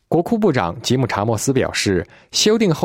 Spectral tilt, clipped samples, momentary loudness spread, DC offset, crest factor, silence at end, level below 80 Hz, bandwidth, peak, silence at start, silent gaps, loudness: -4.5 dB/octave; under 0.1%; 5 LU; under 0.1%; 16 dB; 0 s; -50 dBFS; 16.5 kHz; -2 dBFS; 0.1 s; none; -18 LUFS